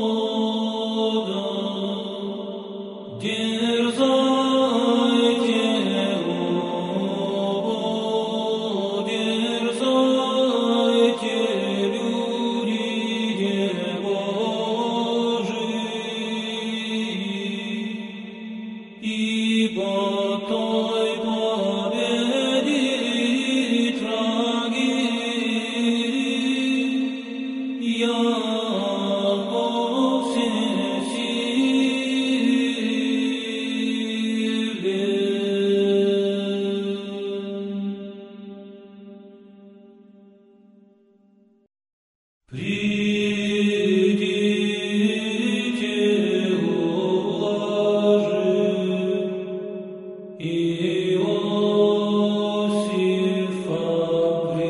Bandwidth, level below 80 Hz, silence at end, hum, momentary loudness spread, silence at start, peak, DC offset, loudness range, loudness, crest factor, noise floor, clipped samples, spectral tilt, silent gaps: 11 kHz; -68 dBFS; 0 s; none; 9 LU; 0 s; -8 dBFS; under 0.1%; 5 LU; -23 LUFS; 16 dB; -58 dBFS; under 0.1%; -5 dB/octave; 41.93-42.41 s